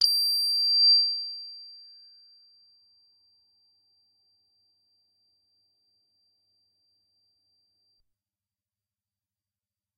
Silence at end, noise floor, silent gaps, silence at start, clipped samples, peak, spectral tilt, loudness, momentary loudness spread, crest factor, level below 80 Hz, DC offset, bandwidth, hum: 8.2 s; under -90 dBFS; none; 0 s; under 0.1%; -8 dBFS; 5.5 dB/octave; -21 LUFS; 27 LU; 24 dB; under -90 dBFS; under 0.1%; 14.5 kHz; none